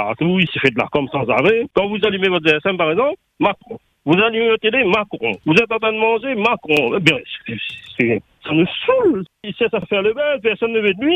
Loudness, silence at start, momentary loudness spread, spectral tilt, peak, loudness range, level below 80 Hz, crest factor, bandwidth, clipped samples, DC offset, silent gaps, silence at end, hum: -17 LUFS; 0 s; 8 LU; -6 dB/octave; 0 dBFS; 2 LU; -54 dBFS; 18 dB; 9.6 kHz; under 0.1%; under 0.1%; none; 0 s; none